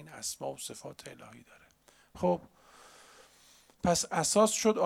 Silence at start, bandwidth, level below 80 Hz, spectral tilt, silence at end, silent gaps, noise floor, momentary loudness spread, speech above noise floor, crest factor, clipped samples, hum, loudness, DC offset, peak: 0 s; 17 kHz; -62 dBFS; -3.5 dB/octave; 0 s; none; -64 dBFS; 22 LU; 33 dB; 20 dB; under 0.1%; none; -30 LUFS; under 0.1%; -12 dBFS